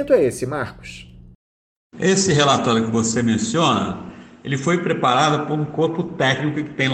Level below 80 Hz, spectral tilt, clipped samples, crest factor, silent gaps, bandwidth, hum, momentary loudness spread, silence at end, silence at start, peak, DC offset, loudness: -52 dBFS; -4.5 dB/octave; under 0.1%; 18 dB; 1.35-1.90 s; 14 kHz; none; 15 LU; 0 s; 0 s; -2 dBFS; under 0.1%; -19 LUFS